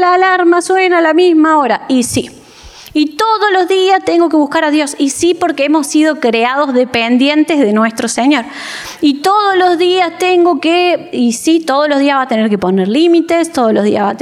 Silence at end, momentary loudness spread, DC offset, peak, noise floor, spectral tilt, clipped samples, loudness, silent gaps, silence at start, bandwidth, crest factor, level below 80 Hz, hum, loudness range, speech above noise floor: 0 s; 5 LU; under 0.1%; -2 dBFS; -35 dBFS; -4 dB/octave; under 0.1%; -11 LUFS; none; 0 s; 15 kHz; 10 dB; -52 dBFS; none; 1 LU; 25 dB